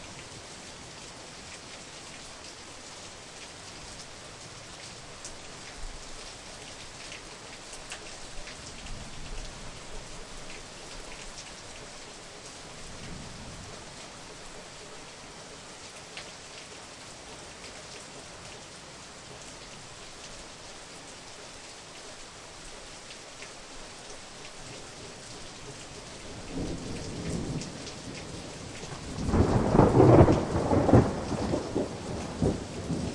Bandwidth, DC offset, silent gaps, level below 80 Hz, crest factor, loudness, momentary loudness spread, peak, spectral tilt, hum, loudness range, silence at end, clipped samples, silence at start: 11.5 kHz; under 0.1%; none; -46 dBFS; 26 dB; -32 LUFS; 16 LU; -6 dBFS; -6 dB/octave; none; 20 LU; 0 s; under 0.1%; 0 s